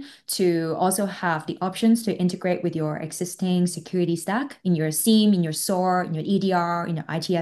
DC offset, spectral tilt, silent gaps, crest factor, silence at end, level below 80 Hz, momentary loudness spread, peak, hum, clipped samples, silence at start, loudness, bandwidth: under 0.1%; -5 dB/octave; none; 14 dB; 0 s; -68 dBFS; 8 LU; -8 dBFS; none; under 0.1%; 0 s; -23 LUFS; 13 kHz